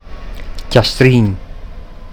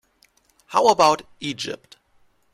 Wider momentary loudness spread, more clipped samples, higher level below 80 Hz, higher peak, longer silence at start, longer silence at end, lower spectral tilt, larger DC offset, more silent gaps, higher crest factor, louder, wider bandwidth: first, 24 LU vs 15 LU; first, 0.2% vs under 0.1%; first, -28 dBFS vs -62 dBFS; first, 0 dBFS vs -4 dBFS; second, 0.05 s vs 0.7 s; second, 0 s vs 0.8 s; first, -6.5 dB/octave vs -3 dB/octave; first, 0.9% vs under 0.1%; neither; about the same, 16 dB vs 20 dB; first, -12 LUFS vs -20 LUFS; about the same, 16 kHz vs 15.5 kHz